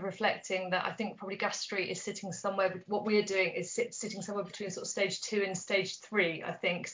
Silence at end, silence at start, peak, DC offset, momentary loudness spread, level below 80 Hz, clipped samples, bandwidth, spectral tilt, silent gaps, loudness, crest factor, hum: 0 s; 0 s; -14 dBFS; under 0.1%; 8 LU; -80 dBFS; under 0.1%; 7.8 kHz; -3.5 dB/octave; none; -33 LUFS; 20 dB; none